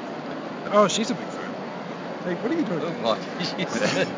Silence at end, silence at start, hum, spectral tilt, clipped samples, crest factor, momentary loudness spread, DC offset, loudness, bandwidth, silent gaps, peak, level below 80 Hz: 0 s; 0 s; none; -4.5 dB/octave; under 0.1%; 20 dB; 13 LU; under 0.1%; -26 LUFS; 7.6 kHz; none; -6 dBFS; -68 dBFS